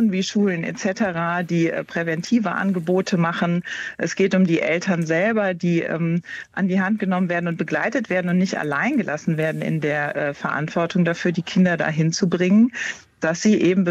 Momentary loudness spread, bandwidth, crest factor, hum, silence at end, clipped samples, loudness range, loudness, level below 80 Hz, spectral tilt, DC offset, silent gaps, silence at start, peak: 7 LU; 8.2 kHz; 14 dB; none; 0 s; under 0.1%; 2 LU; -21 LUFS; -64 dBFS; -6 dB/octave; under 0.1%; none; 0 s; -8 dBFS